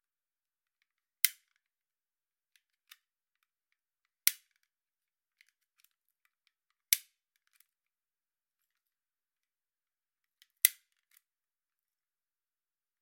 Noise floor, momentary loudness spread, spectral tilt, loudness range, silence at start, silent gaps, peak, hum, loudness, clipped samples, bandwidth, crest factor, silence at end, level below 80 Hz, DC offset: under -90 dBFS; 3 LU; 10.5 dB/octave; 3 LU; 1.25 s; none; -2 dBFS; none; -30 LUFS; under 0.1%; 16.5 kHz; 42 dB; 2.3 s; under -90 dBFS; under 0.1%